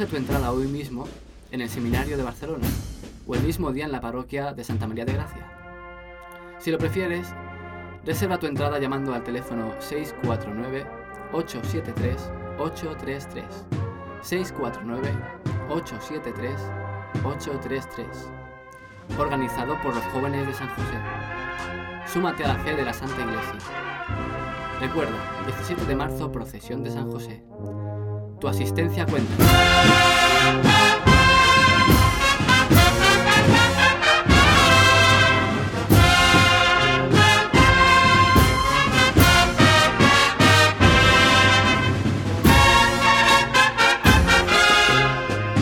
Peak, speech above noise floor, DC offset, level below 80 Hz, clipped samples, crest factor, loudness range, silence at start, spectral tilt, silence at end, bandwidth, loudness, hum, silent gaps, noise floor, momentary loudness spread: -4 dBFS; 19 dB; under 0.1%; -34 dBFS; under 0.1%; 16 dB; 15 LU; 0 s; -4 dB/octave; 0 s; 18 kHz; -18 LUFS; none; none; -44 dBFS; 18 LU